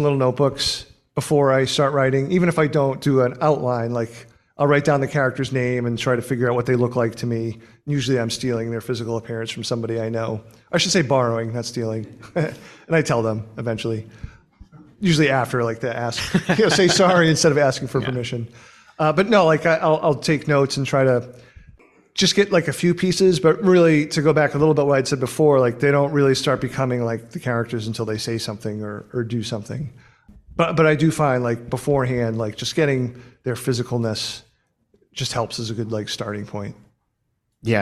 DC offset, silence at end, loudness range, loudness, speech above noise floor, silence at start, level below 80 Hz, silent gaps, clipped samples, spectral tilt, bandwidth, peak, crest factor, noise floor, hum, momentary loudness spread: under 0.1%; 0 s; 8 LU; -20 LUFS; 52 dB; 0 s; -52 dBFS; none; under 0.1%; -5.5 dB/octave; 14 kHz; -4 dBFS; 18 dB; -72 dBFS; none; 12 LU